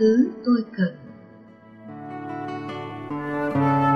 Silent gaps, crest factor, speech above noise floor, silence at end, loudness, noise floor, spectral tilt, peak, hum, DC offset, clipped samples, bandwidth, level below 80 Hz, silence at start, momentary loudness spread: none; 16 dB; 27 dB; 0 s; -25 LUFS; -47 dBFS; -8.5 dB/octave; -8 dBFS; none; under 0.1%; under 0.1%; 6.2 kHz; -62 dBFS; 0 s; 21 LU